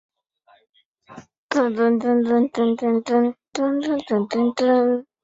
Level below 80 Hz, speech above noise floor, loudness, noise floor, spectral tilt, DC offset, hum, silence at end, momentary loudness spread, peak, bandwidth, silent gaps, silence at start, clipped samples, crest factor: -66 dBFS; 39 dB; -20 LUFS; -59 dBFS; -6 dB/octave; under 0.1%; none; 0.2 s; 5 LU; -8 dBFS; 7.8 kHz; 1.38-1.49 s; 1.1 s; under 0.1%; 14 dB